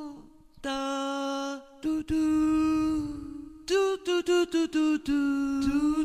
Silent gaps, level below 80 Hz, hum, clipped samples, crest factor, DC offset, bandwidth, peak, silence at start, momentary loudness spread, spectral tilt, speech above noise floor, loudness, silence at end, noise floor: none; -50 dBFS; none; under 0.1%; 12 dB; under 0.1%; 13.5 kHz; -14 dBFS; 0 s; 12 LU; -4.5 dB/octave; 25 dB; -28 LUFS; 0 s; -50 dBFS